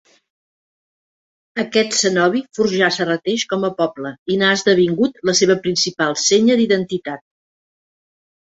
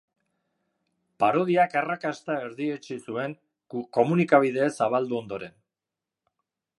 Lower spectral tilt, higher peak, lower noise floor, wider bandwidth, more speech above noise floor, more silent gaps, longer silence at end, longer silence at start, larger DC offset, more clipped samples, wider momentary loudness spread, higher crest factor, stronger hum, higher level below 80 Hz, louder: second, -3.5 dB/octave vs -7 dB/octave; first, 0 dBFS vs -4 dBFS; about the same, under -90 dBFS vs -89 dBFS; second, 8 kHz vs 11.5 kHz; first, over 73 dB vs 64 dB; first, 4.19-4.26 s vs none; about the same, 1.3 s vs 1.3 s; first, 1.55 s vs 1.2 s; neither; neither; second, 11 LU vs 15 LU; about the same, 18 dB vs 22 dB; neither; first, -60 dBFS vs -74 dBFS; first, -17 LUFS vs -25 LUFS